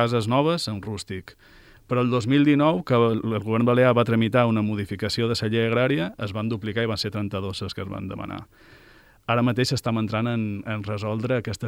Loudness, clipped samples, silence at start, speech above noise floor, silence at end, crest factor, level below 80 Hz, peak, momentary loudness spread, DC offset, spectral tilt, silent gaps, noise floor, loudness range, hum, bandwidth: -23 LUFS; under 0.1%; 0 s; 30 dB; 0 s; 18 dB; -56 dBFS; -6 dBFS; 13 LU; under 0.1%; -6.5 dB/octave; none; -53 dBFS; 7 LU; none; 15 kHz